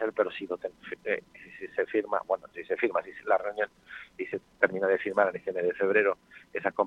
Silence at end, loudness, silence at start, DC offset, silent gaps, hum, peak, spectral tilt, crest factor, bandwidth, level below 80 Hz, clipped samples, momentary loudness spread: 0 s; -30 LUFS; 0 s; under 0.1%; none; none; -6 dBFS; -6.5 dB/octave; 24 dB; 7.2 kHz; -72 dBFS; under 0.1%; 13 LU